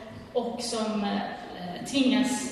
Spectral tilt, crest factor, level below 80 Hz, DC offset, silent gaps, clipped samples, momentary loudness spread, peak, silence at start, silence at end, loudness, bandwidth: -4 dB/octave; 16 dB; -60 dBFS; under 0.1%; none; under 0.1%; 12 LU; -12 dBFS; 0 s; 0 s; -29 LUFS; 13.5 kHz